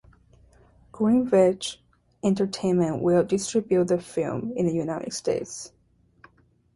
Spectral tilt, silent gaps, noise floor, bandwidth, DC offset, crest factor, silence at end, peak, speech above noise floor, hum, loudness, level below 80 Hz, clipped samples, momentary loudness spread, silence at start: -6 dB/octave; none; -60 dBFS; 11.5 kHz; under 0.1%; 18 dB; 1.1 s; -8 dBFS; 37 dB; none; -24 LUFS; -58 dBFS; under 0.1%; 12 LU; 0.95 s